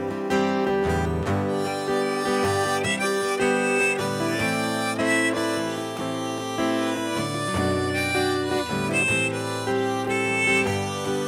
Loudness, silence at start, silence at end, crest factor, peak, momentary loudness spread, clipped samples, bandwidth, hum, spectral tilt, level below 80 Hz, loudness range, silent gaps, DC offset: -24 LUFS; 0 s; 0 s; 12 dB; -12 dBFS; 6 LU; under 0.1%; 16 kHz; none; -4.5 dB/octave; -52 dBFS; 2 LU; none; under 0.1%